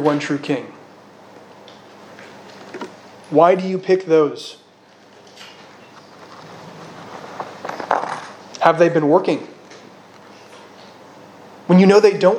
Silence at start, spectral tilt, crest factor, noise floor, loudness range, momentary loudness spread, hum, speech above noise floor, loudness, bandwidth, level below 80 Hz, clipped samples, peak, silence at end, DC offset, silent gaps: 0 s; -6.5 dB/octave; 20 dB; -48 dBFS; 10 LU; 26 LU; none; 34 dB; -16 LUFS; 10 kHz; -72 dBFS; under 0.1%; 0 dBFS; 0 s; under 0.1%; none